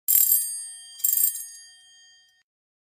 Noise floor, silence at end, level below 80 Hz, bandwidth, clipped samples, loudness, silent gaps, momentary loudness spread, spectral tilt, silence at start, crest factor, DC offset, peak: -56 dBFS; 1.35 s; -84 dBFS; 16 kHz; under 0.1%; -20 LUFS; none; 19 LU; 5 dB/octave; 0.1 s; 24 dB; under 0.1%; -4 dBFS